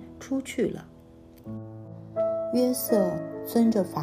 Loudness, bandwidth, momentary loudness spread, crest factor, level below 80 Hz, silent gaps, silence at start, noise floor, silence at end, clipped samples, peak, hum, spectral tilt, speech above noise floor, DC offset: -27 LUFS; 15.5 kHz; 18 LU; 18 dB; -60 dBFS; none; 0 s; -50 dBFS; 0 s; under 0.1%; -10 dBFS; none; -6 dB/octave; 25 dB; under 0.1%